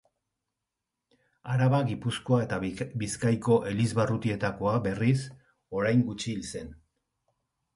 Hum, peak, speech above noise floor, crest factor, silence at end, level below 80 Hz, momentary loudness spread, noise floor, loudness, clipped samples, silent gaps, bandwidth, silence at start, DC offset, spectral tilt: none; -10 dBFS; 59 dB; 18 dB; 1 s; -56 dBFS; 11 LU; -86 dBFS; -28 LUFS; under 0.1%; none; 11.5 kHz; 1.45 s; under 0.1%; -6.5 dB/octave